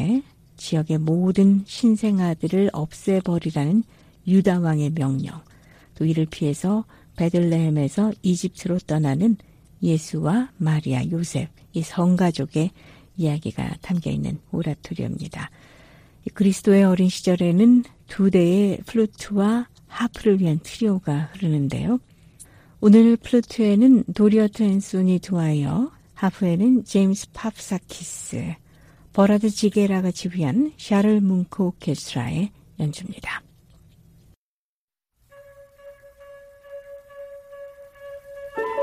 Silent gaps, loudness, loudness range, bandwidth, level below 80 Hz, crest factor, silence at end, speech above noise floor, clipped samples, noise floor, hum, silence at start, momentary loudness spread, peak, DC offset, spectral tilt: 34.37-34.88 s; -21 LUFS; 9 LU; 14.5 kHz; -52 dBFS; 18 dB; 0 s; over 70 dB; under 0.1%; under -90 dBFS; none; 0 s; 16 LU; -2 dBFS; under 0.1%; -7 dB/octave